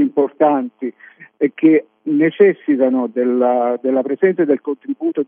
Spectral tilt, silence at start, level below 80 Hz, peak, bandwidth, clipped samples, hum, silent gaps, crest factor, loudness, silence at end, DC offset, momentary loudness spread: -10.5 dB/octave; 0 s; -88 dBFS; -2 dBFS; 3.6 kHz; under 0.1%; none; none; 14 dB; -16 LUFS; 0.05 s; under 0.1%; 8 LU